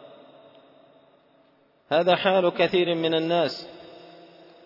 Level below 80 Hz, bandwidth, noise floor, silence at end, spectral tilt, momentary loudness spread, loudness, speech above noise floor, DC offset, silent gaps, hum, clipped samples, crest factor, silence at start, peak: -70 dBFS; 5.8 kHz; -61 dBFS; 0.7 s; -6.5 dB/octave; 21 LU; -23 LUFS; 39 dB; under 0.1%; none; none; under 0.1%; 20 dB; 0.05 s; -8 dBFS